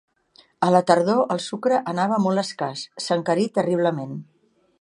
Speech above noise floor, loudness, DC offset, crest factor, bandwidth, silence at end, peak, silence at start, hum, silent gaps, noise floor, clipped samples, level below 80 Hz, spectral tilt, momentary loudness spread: 36 dB; -22 LUFS; under 0.1%; 22 dB; 11.5 kHz; 0.6 s; -2 dBFS; 0.6 s; none; none; -57 dBFS; under 0.1%; -72 dBFS; -5.5 dB/octave; 11 LU